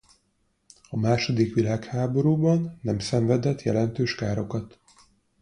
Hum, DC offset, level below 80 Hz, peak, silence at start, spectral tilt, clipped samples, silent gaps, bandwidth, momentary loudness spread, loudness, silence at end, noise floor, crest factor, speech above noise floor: none; under 0.1%; -54 dBFS; -8 dBFS; 0.9 s; -7 dB/octave; under 0.1%; none; 10.5 kHz; 7 LU; -25 LUFS; 0.75 s; -70 dBFS; 18 dB; 46 dB